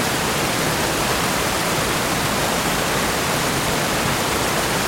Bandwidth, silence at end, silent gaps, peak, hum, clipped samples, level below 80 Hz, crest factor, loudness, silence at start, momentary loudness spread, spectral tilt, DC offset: 16.5 kHz; 0 s; none; -6 dBFS; none; under 0.1%; -38 dBFS; 14 dB; -19 LUFS; 0 s; 0 LU; -3 dB/octave; under 0.1%